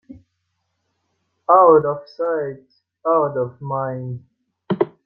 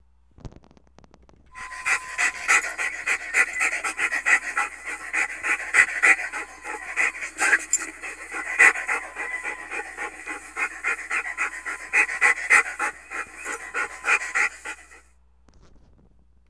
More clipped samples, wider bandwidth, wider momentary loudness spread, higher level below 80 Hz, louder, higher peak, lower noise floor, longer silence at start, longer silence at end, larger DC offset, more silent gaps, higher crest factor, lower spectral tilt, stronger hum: neither; second, 5.6 kHz vs 11 kHz; about the same, 18 LU vs 16 LU; second, -64 dBFS vs -58 dBFS; first, -18 LUFS vs -22 LUFS; about the same, -2 dBFS vs -2 dBFS; first, -73 dBFS vs -58 dBFS; second, 0.1 s vs 0.45 s; second, 0.15 s vs 1.5 s; neither; neither; second, 18 dB vs 24 dB; first, -10.5 dB/octave vs 0 dB/octave; neither